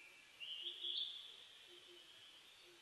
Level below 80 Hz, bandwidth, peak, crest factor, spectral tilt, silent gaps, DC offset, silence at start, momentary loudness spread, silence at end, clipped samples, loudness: under -90 dBFS; 13 kHz; -32 dBFS; 20 dB; 0.5 dB/octave; none; under 0.1%; 0 s; 18 LU; 0 s; under 0.1%; -47 LUFS